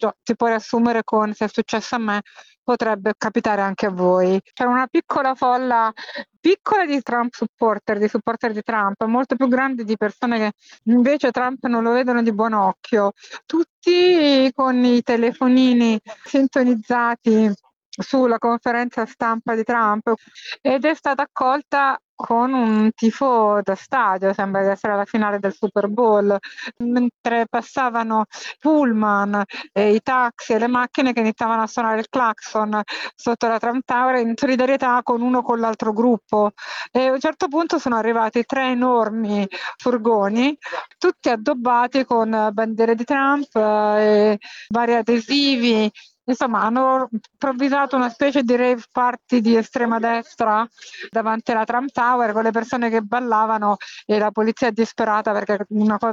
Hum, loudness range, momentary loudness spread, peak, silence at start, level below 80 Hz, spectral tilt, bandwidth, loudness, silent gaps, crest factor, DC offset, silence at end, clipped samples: none; 3 LU; 6 LU; -6 dBFS; 0 s; -64 dBFS; -5.5 dB/octave; 7.6 kHz; -19 LUFS; 2.58-2.66 s, 6.36-6.43 s, 7.49-7.58 s, 13.70-13.82 s, 17.76-17.92 s, 22.04-22.17 s, 27.14-27.24 s; 12 dB; under 0.1%; 0 s; under 0.1%